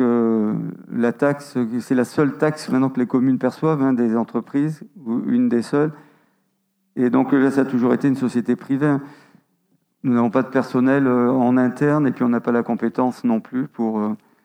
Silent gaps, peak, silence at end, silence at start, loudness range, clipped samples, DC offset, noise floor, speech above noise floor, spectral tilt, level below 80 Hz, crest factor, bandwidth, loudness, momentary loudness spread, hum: none; -4 dBFS; 0.3 s; 0 s; 2 LU; under 0.1%; under 0.1%; -69 dBFS; 50 dB; -8 dB/octave; -72 dBFS; 16 dB; 11 kHz; -20 LUFS; 7 LU; none